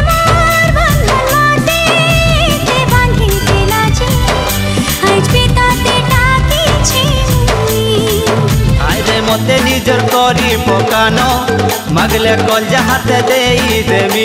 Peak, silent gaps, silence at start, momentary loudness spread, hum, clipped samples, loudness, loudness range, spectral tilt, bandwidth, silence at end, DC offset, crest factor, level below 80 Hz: 0 dBFS; none; 0 s; 3 LU; none; under 0.1%; -10 LUFS; 1 LU; -4.5 dB/octave; 16.5 kHz; 0 s; under 0.1%; 10 dB; -20 dBFS